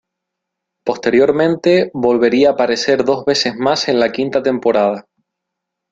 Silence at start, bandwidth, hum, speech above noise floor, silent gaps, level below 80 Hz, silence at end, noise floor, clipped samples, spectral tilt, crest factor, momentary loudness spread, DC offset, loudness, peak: 0.85 s; 7.8 kHz; none; 65 dB; none; -56 dBFS; 0.9 s; -79 dBFS; under 0.1%; -4.5 dB/octave; 14 dB; 6 LU; under 0.1%; -14 LUFS; -2 dBFS